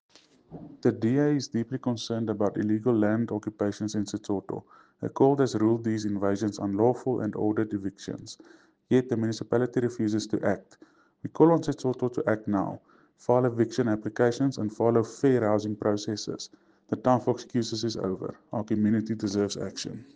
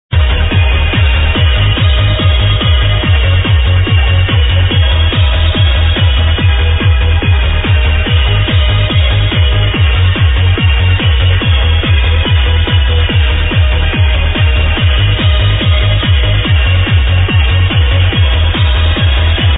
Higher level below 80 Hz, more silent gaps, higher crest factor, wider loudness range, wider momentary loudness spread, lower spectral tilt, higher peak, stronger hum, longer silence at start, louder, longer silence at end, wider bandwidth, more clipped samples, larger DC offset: second, -66 dBFS vs -12 dBFS; neither; first, 20 dB vs 8 dB; about the same, 3 LU vs 1 LU; first, 12 LU vs 1 LU; second, -6.5 dB/octave vs -9 dB/octave; second, -6 dBFS vs 0 dBFS; neither; first, 0.5 s vs 0.1 s; second, -27 LUFS vs -10 LUFS; first, 0.15 s vs 0 s; first, 9.6 kHz vs 4 kHz; neither; second, under 0.1% vs 0.7%